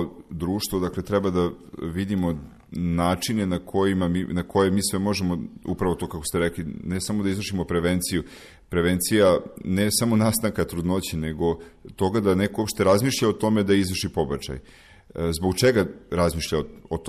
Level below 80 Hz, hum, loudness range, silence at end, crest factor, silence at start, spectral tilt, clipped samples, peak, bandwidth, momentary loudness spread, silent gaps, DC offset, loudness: -44 dBFS; none; 3 LU; 0 s; 16 dB; 0 s; -5 dB/octave; under 0.1%; -8 dBFS; 14.5 kHz; 10 LU; none; under 0.1%; -24 LUFS